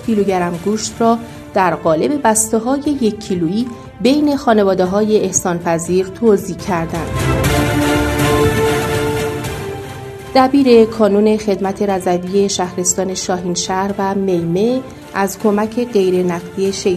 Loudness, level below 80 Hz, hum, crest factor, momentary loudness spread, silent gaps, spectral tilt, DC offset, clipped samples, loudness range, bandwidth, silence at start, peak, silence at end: -15 LUFS; -36 dBFS; none; 14 dB; 7 LU; none; -5 dB/octave; under 0.1%; under 0.1%; 3 LU; 14 kHz; 0 s; 0 dBFS; 0 s